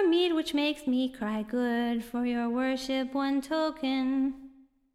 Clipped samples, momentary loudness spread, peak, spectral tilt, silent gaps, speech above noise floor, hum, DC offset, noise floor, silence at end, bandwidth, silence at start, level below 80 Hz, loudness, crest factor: under 0.1%; 4 LU; -18 dBFS; -4.5 dB/octave; none; 26 dB; none; under 0.1%; -54 dBFS; 0.45 s; 14 kHz; 0 s; -62 dBFS; -29 LUFS; 12 dB